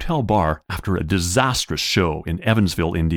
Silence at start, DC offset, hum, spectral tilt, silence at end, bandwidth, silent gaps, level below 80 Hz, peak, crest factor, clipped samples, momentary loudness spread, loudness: 0 s; under 0.1%; none; -5 dB/octave; 0 s; 19 kHz; none; -34 dBFS; -2 dBFS; 18 dB; under 0.1%; 6 LU; -20 LUFS